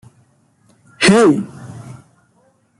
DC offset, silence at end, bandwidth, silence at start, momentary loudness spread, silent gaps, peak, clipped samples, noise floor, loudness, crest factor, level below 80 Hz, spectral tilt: under 0.1%; 0.85 s; 12 kHz; 1 s; 24 LU; none; 0 dBFS; under 0.1%; -57 dBFS; -13 LUFS; 18 dB; -54 dBFS; -5 dB/octave